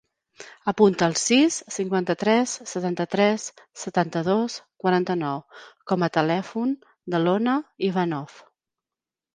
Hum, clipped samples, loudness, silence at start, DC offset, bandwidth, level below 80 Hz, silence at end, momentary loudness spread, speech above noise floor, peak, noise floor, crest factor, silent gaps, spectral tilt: none; under 0.1%; -24 LUFS; 0.4 s; under 0.1%; 10 kHz; -68 dBFS; 0.95 s; 11 LU; 67 dB; -4 dBFS; -90 dBFS; 20 dB; none; -4.5 dB/octave